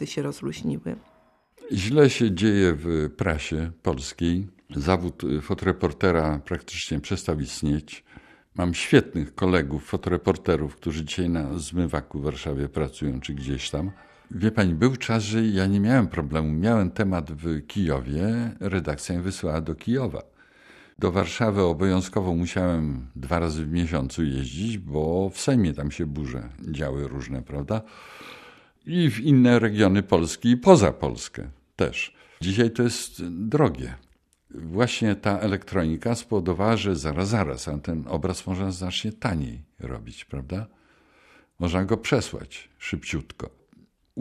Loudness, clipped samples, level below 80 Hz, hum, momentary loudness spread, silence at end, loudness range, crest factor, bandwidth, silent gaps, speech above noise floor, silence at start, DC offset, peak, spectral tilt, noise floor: -25 LUFS; under 0.1%; -42 dBFS; none; 14 LU; 0 s; 8 LU; 24 dB; 13.5 kHz; none; 34 dB; 0 s; under 0.1%; 0 dBFS; -6 dB/octave; -59 dBFS